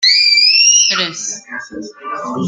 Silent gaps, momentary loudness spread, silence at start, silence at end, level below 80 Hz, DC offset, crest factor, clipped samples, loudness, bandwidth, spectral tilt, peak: none; 21 LU; 0 s; 0 s; -64 dBFS; under 0.1%; 12 dB; under 0.1%; -8 LUFS; 13 kHz; 0 dB/octave; 0 dBFS